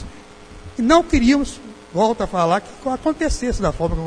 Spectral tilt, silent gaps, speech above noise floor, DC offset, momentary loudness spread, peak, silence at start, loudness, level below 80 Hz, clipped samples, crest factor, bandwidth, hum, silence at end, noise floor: -5.5 dB/octave; none; 22 dB; under 0.1%; 13 LU; 0 dBFS; 0 s; -19 LUFS; -30 dBFS; under 0.1%; 20 dB; 10.5 kHz; none; 0 s; -40 dBFS